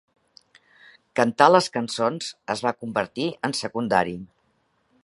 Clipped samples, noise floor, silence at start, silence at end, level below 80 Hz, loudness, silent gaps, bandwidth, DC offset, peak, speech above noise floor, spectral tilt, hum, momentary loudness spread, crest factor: under 0.1%; -68 dBFS; 1.15 s; 0.8 s; -64 dBFS; -23 LUFS; none; 11.5 kHz; under 0.1%; 0 dBFS; 45 dB; -4.5 dB/octave; none; 13 LU; 24 dB